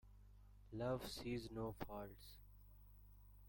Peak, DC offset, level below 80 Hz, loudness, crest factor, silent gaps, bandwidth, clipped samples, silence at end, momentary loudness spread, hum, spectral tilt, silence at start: -32 dBFS; under 0.1%; -64 dBFS; -49 LUFS; 20 dB; none; 17 kHz; under 0.1%; 0 s; 22 LU; 50 Hz at -60 dBFS; -6 dB/octave; 0.05 s